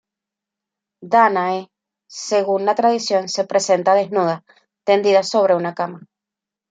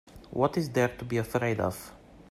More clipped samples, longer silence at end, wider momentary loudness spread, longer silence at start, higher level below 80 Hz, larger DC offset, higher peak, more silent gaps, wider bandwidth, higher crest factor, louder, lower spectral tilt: neither; first, 0.7 s vs 0.1 s; about the same, 12 LU vs 12 LU; first, 1 s vs 0.05 s; second, -72 dBFS vs -56 dBFS; neither; first, -2 dBFS vs -12 dBFS; neither; second, 9.4 kHz vs 15.5 kHz; about the same, 18 dB vs 18 dB; first, -18 LUFS vs -29 LUFS; second, -4 dB/octave vs -6.5 dB/octave